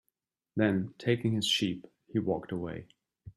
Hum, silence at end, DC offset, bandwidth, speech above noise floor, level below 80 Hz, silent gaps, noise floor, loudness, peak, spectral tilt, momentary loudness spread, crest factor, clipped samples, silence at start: none; 0.05 s; under 0.1%; 14 kHz; 53 dB; -66 dBFS; none; -83 dBFS; -31 LUFS; -12 dBFS; -5 dB/octave; 12 LU; 20 dB; under 0.1%; 0.55 s